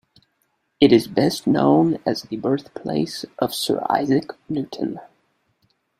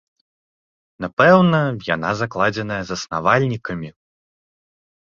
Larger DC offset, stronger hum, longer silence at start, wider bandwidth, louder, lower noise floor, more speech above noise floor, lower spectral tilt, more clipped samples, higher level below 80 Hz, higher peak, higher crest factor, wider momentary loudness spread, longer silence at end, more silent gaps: neither; neither; second, 0.8 s vs 1 s; first, 16 kHz vs 7.6 kHz; second, -21 LUFS vs -18 LUFS; second, -70 dBFS vs under -90 dBFS; second, 50 dB vs over 72 dB; about the same, -6 dB/octave vs -6 dB/octave; neither; second, -58 dBFS vs -52 dBFS; about the same, -2 dBFS vs -2 dBFS; about the same, 20 dB vs 18 dB; second, 12 LU vs 16 LU; second, 0.95 s vs 1.15 s; second, none vs 1.13-1.17 s